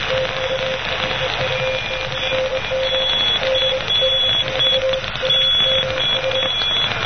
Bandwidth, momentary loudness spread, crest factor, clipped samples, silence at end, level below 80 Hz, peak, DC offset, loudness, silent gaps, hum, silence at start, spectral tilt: 6.6 kHz; 7 LU; 16 dB; under 0.1%; 0 s; -40 dBFS; -2 dBFS; 1%; -17 LUFS; none; none; 0 s; -3 dB/octave